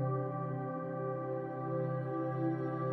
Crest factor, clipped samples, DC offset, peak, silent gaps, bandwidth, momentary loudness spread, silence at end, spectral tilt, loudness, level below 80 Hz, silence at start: 12 dB; under 0.1%; under 0.1%; -24 dBFS; none; 3.8 kHz; 3 LU; 0 s; -11.5 dB/octave; -37 LUFS; -76 dBFS; 0 s